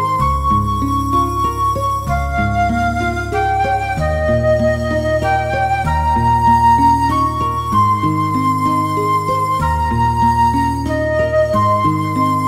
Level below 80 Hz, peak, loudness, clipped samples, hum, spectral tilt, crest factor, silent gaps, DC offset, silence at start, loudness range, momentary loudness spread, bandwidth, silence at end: -26 dBFS; -2 dBFS; -15 LUFS; under 0.1%; none; -6.5 dB/octave; 14 dB; none; 0.2%; 0 s; 3 LU; 5 LU; 16 kHz; 0 s